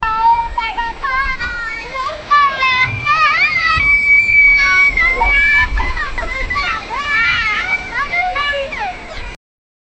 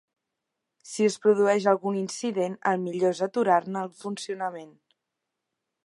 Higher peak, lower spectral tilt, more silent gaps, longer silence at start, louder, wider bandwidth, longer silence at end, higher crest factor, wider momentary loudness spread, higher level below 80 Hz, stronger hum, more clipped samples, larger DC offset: first, -2 dBFS vs -8 dBFS; second, -3 dB/octave vs -5 dB/octave; neither; second, 0 s vs 0.85 s; first, -13 LUFS vs -26 LUFS; second, 8.4 kHz vs 11.5 kHz; second, 0.65 s vs 1.15 s; second, 12 dB vs 20 dB; about the same, 14 LU vs 12 LU; first, -28 dBFS vs -80 dBFS; neither; neither; neither